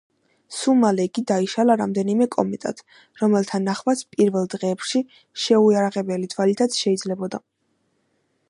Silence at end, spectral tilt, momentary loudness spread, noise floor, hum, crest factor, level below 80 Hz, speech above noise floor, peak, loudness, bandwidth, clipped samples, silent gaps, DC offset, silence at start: 1.1 s; -5.5 dB/octave; 11 LU; -69 dBFS; none; 18 dB; -70 dBFS; 49 dB; -2 dBFS; -21 LUFS; 11.5 kHz; under 0.1%; none; under 0.1%; 0.5 s